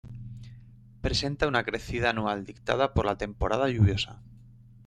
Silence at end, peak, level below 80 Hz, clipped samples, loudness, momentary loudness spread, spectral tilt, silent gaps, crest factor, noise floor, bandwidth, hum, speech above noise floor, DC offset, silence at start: 0.35 s; -10 dBFS; -42 dBFS; under 0.1%; -28 LUFS; 18 LU; -5.5 dB/octave; none; 20 dB; -52 dBFS; 10.5 kHz; none; 25 dB; under 0.1%; 0.05 s